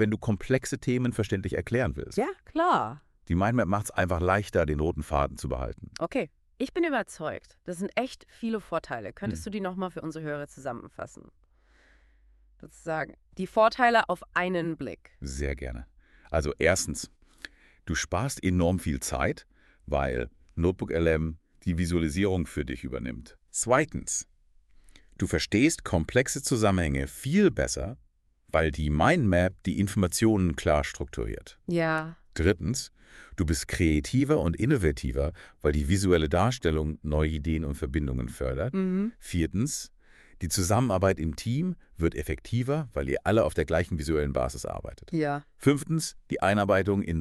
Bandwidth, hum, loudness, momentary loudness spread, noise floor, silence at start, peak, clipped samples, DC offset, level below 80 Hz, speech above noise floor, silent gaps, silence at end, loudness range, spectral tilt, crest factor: 13.5 kHz; none; -28 LUFS; 13 LU; -61 dBFS; 0 s; -8 dBFS; under 0.1%; under 0.1%; -40 dBFS; 34 dB; none; 0 s; 6 LU; -5.5 dB/octave; 20 dB